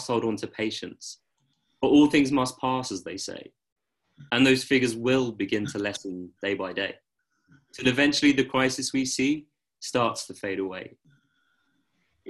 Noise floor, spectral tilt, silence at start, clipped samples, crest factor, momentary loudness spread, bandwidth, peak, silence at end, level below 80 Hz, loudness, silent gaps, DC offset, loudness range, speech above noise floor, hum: -73 dBFS; -4 dB/octave; 0 s; under 0.1%; 20 dB; 15 LU; 12.5 kHz; -8 dBFS; 0 s; -62 dBFS; -25 LUFS; 3.72-3.76 s; under 0.1%; 4 LU; 48 dB; none